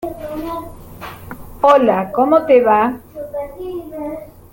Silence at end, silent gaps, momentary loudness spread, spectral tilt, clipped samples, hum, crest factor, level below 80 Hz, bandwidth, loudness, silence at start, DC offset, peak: 0.2 s; none; 22 LU; -6.5 dB/octave; under 0.1%; none; 16 dB; -44 dBFS; 17 kHz; -15 LUFS; 0 s; under 0.1%; 0 dBFS